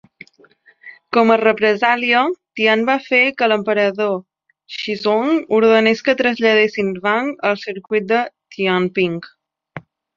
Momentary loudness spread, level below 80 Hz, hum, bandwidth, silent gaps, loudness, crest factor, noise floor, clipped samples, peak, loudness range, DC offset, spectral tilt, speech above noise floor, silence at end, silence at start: 12 LU; -64 dBFS; none; 7.2 kHz; none; -16 LUFS; 16 dB; -52 dBFS; under 0.1%; -2 dBFS; 3 LU; under 0.1%; -5.5 dB/octave; 36 dB; 0.35 s; 0.85 s